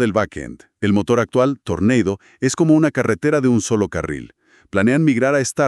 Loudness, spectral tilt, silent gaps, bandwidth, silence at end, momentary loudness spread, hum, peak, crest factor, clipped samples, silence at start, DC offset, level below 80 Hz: -18 LUFS; -6 dB/octave; none; 12 kHz; 0 s; 10 LU; none; -4 dBFS; 14 dB; under 0.1%; 0 s; under 0.1%; -48 dBFS